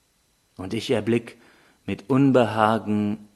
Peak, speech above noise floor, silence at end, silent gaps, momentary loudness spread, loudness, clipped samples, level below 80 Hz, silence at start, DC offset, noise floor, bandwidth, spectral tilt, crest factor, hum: -4 dBFS; 44 dB; 0.1 s; none; 15 LU; -23 LUFS; under 0.1%; -62 dBFS; 0.6 s; under 0.1%; -66 dBFS; 12.5 kHz; -7 dB/octave; 20 dB; none